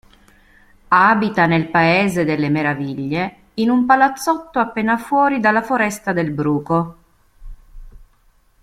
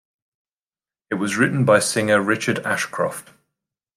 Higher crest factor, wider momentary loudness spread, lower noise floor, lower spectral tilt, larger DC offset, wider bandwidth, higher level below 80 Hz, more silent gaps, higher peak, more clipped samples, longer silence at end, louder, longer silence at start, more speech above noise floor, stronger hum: about the same, 18 dB vs 20 dB; about the same, 8 LU vs 10 LU; second, -55 dBFS vs under -90 dBFS; first, -6 dB/octave vs -4.5 dB/octave; neither; about the same, 15.5 kHz vs 15.5 kHz; first, -46 dBFS vs -66 dBFS; neither; about the same, -2 dBFS vs -4 dBFS; neither; second, 0.6 s vs 0.75 s; first, -17 LUFS vs -20 LUFS; second, 0.9 s vs 1.1 s; second, 39 dB vs over 70 dB; neither